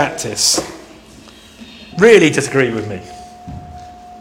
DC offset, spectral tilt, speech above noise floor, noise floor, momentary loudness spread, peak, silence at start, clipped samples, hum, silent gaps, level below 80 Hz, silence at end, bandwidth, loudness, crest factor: under 0.1%; -3.5 dB/octave; 27 dB; -40 dBFS; 26 LU; 0 dBFS; 0 s; 0.1%; none; none; -46 dBFS; 0 s; 17 kHz; -13 LUFS; 16 dB